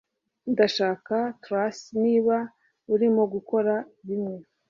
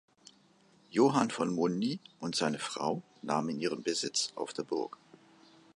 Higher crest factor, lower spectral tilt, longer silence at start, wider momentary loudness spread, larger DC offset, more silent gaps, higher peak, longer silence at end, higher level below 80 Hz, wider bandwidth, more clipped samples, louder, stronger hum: second, 18 dB vs 24 dB; first, -6 dB/octave vs -4 dB/octave; second, 0.45 s vs 0.9 s; about the same, 9 LU vs 9 LU; neither; neither; about the same, -8 dBFS vs -10 dBFS; second, 0.3 s vs 0.9 s; first, -72 dBFS vs -78 dBFS; second, 7.4 kHz vs 11.5 kHz; neither; first, -25 LUFS vs -33 LUFS; neither